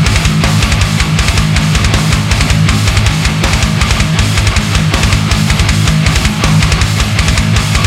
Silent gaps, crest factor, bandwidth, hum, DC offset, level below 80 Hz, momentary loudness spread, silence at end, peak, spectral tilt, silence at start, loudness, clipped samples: none; 10 dB; 16 kHz; none; under 0.1%; -16 dBFS; 1 LU; 0 s; 0 dBFS; -4.5 dB/octave; 0 s; -10 LUFS; under 0.1%